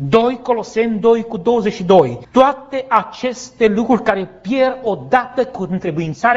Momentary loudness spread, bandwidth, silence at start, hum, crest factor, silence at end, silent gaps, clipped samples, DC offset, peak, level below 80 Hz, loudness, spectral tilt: 9 LU; 7.8 kHz; 0 s; none; 16 dB; 0 s; none; under 0.1%; under 0.1%; 0 dBFS; -50 dBFS; -16 LUFS; -6 dB/octave